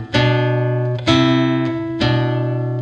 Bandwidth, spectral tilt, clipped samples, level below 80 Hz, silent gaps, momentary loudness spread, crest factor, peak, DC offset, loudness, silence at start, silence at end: 8.4 kHz; -7 dB/octave; under 0.1%; -42 dBFS; none; 6 LU; 14 dB; -2 dBFS; under 0.1%; -17 LUFS; 0 s; 0 s